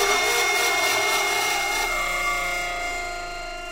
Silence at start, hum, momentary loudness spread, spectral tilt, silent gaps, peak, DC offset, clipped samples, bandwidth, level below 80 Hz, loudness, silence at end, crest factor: 0 s; none; 11 LU; 0 dB/octave; none; -8 dBFS; under 0.1%; under 0.1%; 16 kHz; -42 dBFS; -22 LUFS; 0 s; 14 dB